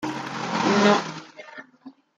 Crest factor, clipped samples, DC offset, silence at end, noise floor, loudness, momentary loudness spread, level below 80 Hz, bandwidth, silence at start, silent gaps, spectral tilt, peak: 20 dB; under 0.1%; under 0.1%; 0.3 s; -49 dBFS; -22 LUFS; 23 LU; -70 dBFS; 9 kHz; 0 s; none; -4.5 dB/octave; -6 dBFS